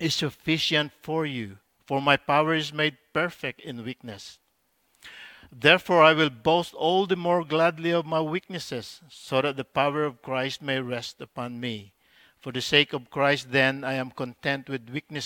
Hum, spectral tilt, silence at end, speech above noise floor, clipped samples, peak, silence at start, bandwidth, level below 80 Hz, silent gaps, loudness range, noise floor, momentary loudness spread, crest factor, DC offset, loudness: none; -4.5 dB/octave; 0 s; 45 dB; under 0.1%; -2 dBFS; 0 s; 18 kHz; -66 dBFS; none; 7 LU; -71 dBFS; 16 LU; 24 dB; under 0.1%; -25 LUFS